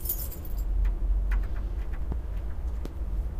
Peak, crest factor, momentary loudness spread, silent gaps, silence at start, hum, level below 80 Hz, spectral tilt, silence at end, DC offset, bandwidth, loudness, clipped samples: -16 dBFS; 12 dB; 6 LU; none; 0 s; none; -30 dBFS; -6 dB/octave; 0 s; under 0.1%; 15.5 kHz; -33 LUFS; under 0.1%